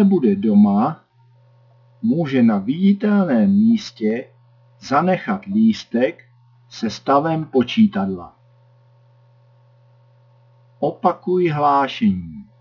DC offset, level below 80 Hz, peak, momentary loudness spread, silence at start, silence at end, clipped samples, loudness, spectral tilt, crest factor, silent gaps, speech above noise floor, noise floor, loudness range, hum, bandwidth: under 0.1%; -64 dBFS; -4 dBFS; 11 LU; 0 s; 0.2 s; under 0.1%; -18 LUFS; -7.5 dB/octave; 16 dB; none; 36 dB; -53 dBFS; 7 LU; none; 6 kHz